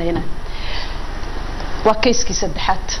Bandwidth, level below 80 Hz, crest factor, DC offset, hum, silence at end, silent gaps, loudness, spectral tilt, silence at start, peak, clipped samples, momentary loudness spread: 10.5 kHz; -26 dBFS; 16 dB; under 0.1%; none; 0 s; none; -21 LUFS; -3.5 dB/octave; 0 s; -2 dBFS; under 0.1%; 13 LU